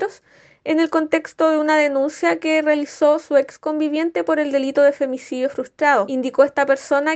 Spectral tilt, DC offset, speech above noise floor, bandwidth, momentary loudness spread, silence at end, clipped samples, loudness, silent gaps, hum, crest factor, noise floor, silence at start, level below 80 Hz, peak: -3.5 dB/octave; under 0.1%; 34 dB; 8.6 kHz; 8 LU; 0 s; under 0.1%; -19 LUFS; none; none; 16 dB; -52 dBFS; 0 s; -70 dBFS; -2 dBFS